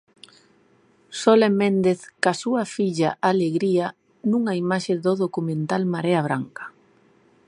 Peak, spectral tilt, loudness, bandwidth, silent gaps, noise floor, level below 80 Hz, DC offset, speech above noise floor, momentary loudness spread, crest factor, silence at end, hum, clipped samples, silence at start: -2 dBFS; -6 dB/octave; -22 LUFS; 11 kHz; none; -59 dBFS; -70 dBFS; under 0.1%; 38 dB; 10 LU; 20 dB; 0.8 s; none; under 0.1%; 1.1 s